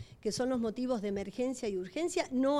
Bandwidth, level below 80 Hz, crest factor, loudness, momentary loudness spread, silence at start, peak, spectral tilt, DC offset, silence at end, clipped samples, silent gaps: 14 kHz; -62 dBFS; 14 dB; -34 LUFS; 4 LU; 0 s; -18 dBFS; -5 dB/octave; under 0.1%; 0 s; under 0.1%; none